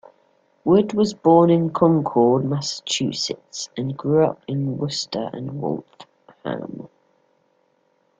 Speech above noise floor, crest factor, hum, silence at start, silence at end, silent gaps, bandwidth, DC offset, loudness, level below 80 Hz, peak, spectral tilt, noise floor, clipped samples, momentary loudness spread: 45 dB; 18 dB; none; 0.65 s; 1.35 s; none; 9.4 kHz; under 0.1%; -21 LUFS; -60 dBFS; -2 dBFS; -6 dB/octave; -65 dBFS; under 0.1%; 14 LU